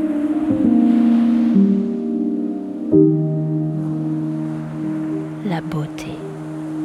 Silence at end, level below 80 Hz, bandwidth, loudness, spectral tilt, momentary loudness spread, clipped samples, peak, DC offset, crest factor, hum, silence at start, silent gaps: 0 s; -54 dBFS; 9.2 kHz; -19 LUFS; -9.5 dB/octave; 12 LU; under 0.1%; -2 dBFS; under 0.1%; 16 dB; none; 0 s; none